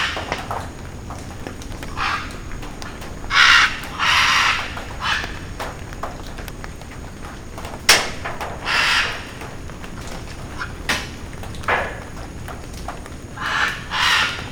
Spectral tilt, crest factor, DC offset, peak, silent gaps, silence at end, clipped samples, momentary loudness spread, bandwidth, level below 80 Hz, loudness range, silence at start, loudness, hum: -2 dB/octave; 22 dB; under 0.1%; 0 dBFS; none; 0 s; under 0.1%; 19 LU; over 20 kHz; -36 dBFS; 10 LU; 0 s; -18 LUFS; none